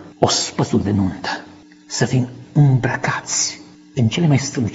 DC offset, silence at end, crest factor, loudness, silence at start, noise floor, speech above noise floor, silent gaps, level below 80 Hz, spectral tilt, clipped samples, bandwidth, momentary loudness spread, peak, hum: under 0.1%; 0 s; 18 dB; -19 LUFS; 0 s; -42 dBFS; 25 dB; none; -50 dBFS; -4.5 dB/octave; under 0.1%; 8 kHz; 11 LU; 0 dBFS; none